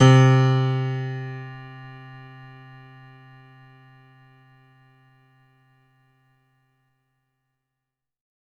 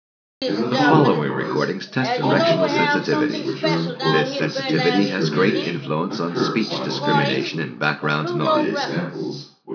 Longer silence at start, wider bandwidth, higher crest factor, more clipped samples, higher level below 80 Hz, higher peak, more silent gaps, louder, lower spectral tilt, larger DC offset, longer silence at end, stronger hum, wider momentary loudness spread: second, 0 s vs 0.4 s; first, 7.8 kHz vs 5.4 kHz; about the same, 22 dB vs 18 dB; neither; first, -62 dBFS vs -82 dBFS; about the same, -4 dBFS vs -2 dBFS; neither; about the same, -20 LUFS vs -20 LUFS; about the same, -7 dB/octave vs -6 dB/octave; neither; first, 6.3 s vs 0 s; neither; first, 29 LU vs 7 LU